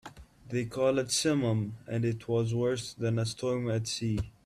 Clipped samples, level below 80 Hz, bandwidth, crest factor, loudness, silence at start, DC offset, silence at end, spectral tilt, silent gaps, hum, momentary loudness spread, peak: under 0.1%; -56 dBFS; 14 kHz; 16 dB; -31 LUFS; 0.05 s; under 0.1%; 0.15 s; -5 dB/octave; none; none; 7 LU; -16 dBFS